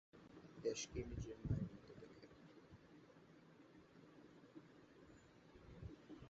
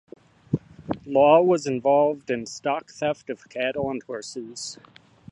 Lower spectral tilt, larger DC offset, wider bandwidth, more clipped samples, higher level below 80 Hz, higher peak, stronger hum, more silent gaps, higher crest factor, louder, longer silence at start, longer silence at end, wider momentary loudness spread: about the same, -6.5 dB/octave vs -5.5 dB/octave; neither; second, 7.6 kHz vs 11 kHz; neither; about the same, -64 dBFS vs -60 dBFS; second, -30 dBFS vs -4 dBFS; neither; neither; about the same, 24 dB vs 20 dB; second, -51 LUFS vs -24 LUFS; second, 0.15 s vs 0.5 s; second, 0 s vs 0.6 s; first, 20 LU vs 17 LU